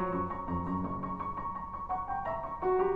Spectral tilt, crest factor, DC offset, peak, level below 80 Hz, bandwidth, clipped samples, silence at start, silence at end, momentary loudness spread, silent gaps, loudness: -10 dB/octave; 16 dB; under 0.1%; -18 dBFS; -50 dBFS; 4.8 kHz; under 0.1%; 0 s; 0 s; 5 LU; none; -35 LUFS